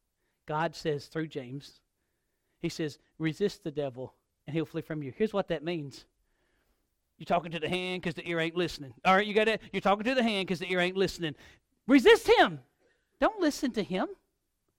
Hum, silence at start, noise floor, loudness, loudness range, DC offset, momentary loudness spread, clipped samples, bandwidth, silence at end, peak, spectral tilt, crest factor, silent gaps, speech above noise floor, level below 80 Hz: none; 0.45 s; -80 dBFS; -29 LUFS; 10 LU; under 0.1%; 14 LU; under 0.1%; 16.5 kHz; 0.65 s; -10 dBFS; -5 dB/octave; 22 dB; none; 50 dB; -60 dBFS